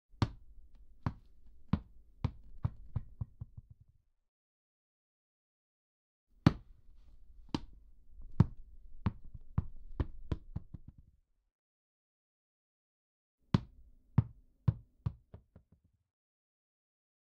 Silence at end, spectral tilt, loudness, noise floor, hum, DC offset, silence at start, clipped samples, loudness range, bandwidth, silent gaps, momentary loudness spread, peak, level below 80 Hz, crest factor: 1.7 s; -7.5 dB/octave; -38 LUFS; -71 dBFS; none; under 0.1%; 0.15 s; under 0.1%; 10 LU; 7.6 kHz; 4.28-6.27 s, 11.52-13.38 s; 24 LU; -8 dBFS; -52 dBFS; 32 dB